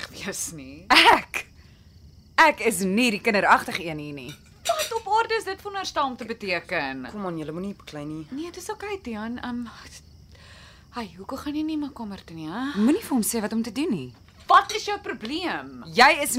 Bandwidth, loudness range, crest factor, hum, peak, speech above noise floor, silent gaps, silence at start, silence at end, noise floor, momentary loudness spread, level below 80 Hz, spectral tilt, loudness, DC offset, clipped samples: 16 kHz; 13 LU; 20 dB; none; -4 dBFS; 26 dB; none; 0 s; 0 s; -51 dBFS; 18 LU; -54 dBFS; -3 dB/octave; -24 LUFS; under 0.1%; under 0.1%